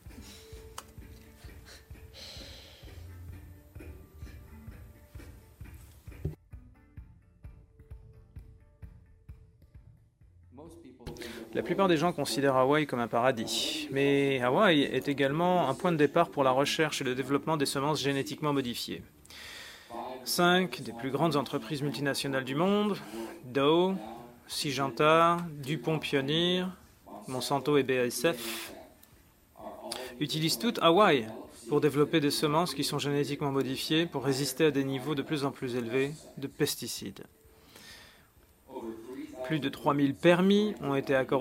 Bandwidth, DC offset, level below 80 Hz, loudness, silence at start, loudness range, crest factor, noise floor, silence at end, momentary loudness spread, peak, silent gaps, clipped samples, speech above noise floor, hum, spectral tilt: 16 kHz; under 0.1%; -58 dBFS; -29 LUFS; 0.05 s; 21 LU; 22 dB; -61 dBFS; 0 s; 24 LU; -8 dBFS; none; under 0.1%; 33 dB; none; -5 dB/octave